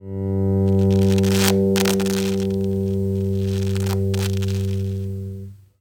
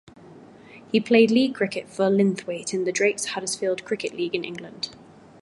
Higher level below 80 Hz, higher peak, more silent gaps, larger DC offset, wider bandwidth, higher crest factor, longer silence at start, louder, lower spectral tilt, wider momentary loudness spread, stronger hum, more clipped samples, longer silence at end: first, -48 dBFS vs -70 dBFS; first, 0 dBFS vs -4 dBFS; neither; neither; first, 19 kHz vs 11.5 kHz; about the same, 20 dB vs 20 dB; second, 0 s vs 0.25 s; first, -20 LUFS vs -24 LUFS; first, -6 dB/octave vs -4.5 dB/octave; second, 10 LU vs 14 LU; neither; neither; second, 0.25 s vs 0.45 s